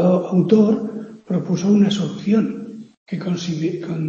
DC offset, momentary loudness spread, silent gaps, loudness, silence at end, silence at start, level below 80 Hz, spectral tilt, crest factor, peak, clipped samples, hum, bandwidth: under 0.1%; 16 LU; 2.97-3.06 s; -19 LUFS; 0 s; 0 s; -62 dBFS; -7.5 dB/octave; 18 dB; -2 dBFS; under 0.1%; none; 7.4 kHz